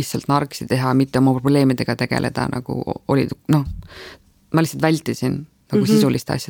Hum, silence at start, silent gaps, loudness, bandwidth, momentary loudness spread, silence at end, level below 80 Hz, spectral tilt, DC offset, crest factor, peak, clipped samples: none; 0 s; none; -19 LUFS; 19 kHz; 10 LU; 0.05 s; -44 dBFS; -6.5 dB/octave; under 0.1%; 16 dB; -4 dBFS; under 0.1%